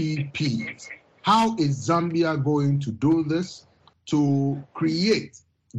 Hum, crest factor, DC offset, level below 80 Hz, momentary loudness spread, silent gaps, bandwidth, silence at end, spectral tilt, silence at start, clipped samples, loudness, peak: none; 16 dB; under 0.1%; -60 dBFS; 14 LU; none; 9.8 kHz; 0 s; -6.5 dB/octave; 0 s; under 0.1%; -23 LUFS; -8 dBFS